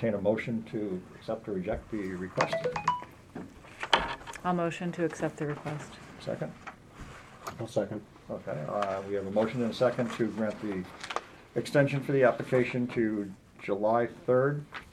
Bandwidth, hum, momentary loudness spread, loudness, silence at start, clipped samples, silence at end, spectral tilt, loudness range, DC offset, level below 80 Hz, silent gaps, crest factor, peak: 14 kHz; none; 15 LU; -31 LUFS; 0 s; under 0.1%; 0 s; -6 dB/octave; 7 LU; under 0.1%; -58 dBFS; none; 26 dB; -6 dBFS